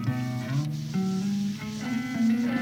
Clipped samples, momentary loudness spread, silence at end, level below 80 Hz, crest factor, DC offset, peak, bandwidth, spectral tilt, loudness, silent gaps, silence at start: under 0.1%; 6 LU; 0 s; -60 dBFS; 12 dB; under 0.1%; -14 dBFS; 16.5 kHz; -6.5 dB/octave; -29 LUFS; none; 0 s